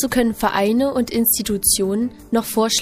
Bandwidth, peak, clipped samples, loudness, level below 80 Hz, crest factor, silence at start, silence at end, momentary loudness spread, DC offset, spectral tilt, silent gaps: 15.5 kHz; -2 dBFS; under 0.1%; -18 LUFS; -42 dBFS; 16 dB; 0 s; 0 s; 5 LU; under 0.1%; -3 dB/octave; none